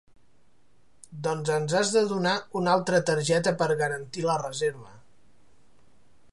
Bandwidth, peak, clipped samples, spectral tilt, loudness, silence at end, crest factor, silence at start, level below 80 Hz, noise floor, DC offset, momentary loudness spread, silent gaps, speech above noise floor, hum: 11.5 kHz; -8 dBFS; under 0.1%; -4.5 dB/octave; -26 LUFS; 1.35 s; 20 dB; 1.1 s; -70 dBFS; -67 dBFS; 0.3%; 8 LU; none; 41 dB; none